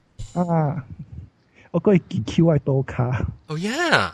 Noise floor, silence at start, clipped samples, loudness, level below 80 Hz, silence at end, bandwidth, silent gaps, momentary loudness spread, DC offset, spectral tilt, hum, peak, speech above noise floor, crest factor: -48 dBFS; 0.2 s; under 0.1%; -22 LUFS; -42 dBFS; 0 s; 11.5 kHz; none; 17 LU; under 0.1%; -6.5 dB/octave; none; 0 dBFS; 28 dB; 22 dB